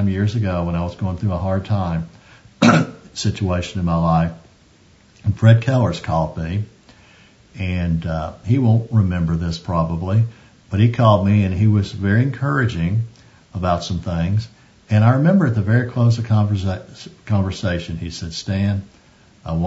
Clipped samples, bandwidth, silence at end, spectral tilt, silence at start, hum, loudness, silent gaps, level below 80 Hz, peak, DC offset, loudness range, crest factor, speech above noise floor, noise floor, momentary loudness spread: under 0.1%; 8 kHz; 0 s; -7.5 dB/octave; 0 s; none; -19 LUFS; none; -40 dBFS; 0 dBFS; under 0.1%; 3 LU; 18 dB; 34 dB; -51 dBFS; 12 LU